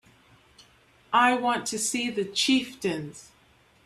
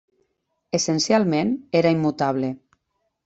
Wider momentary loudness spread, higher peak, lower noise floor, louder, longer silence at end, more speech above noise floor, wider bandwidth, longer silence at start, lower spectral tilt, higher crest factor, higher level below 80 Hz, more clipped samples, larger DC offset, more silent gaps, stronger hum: about the same, 9 LU vs 8 LU; about the same, -8 dBFS vs -6 dBFS; second, -60 dBFS vs -74 dBFS; second, -25 LUFS vs -21 LUFS; about the same, 0.65 s vs 0.7 s; second, 34 dB vs 54 dB; first, 13.5 kHz vs 8.2 kHz; first, 1.1 s vs 0.75 s; second, -2.5 dB/octave vs -5 dB/octave; about the same, 20 dB vs 18 dB; about the same, -66 dBFS vs -64 dBFS; neither; neither; neither; neither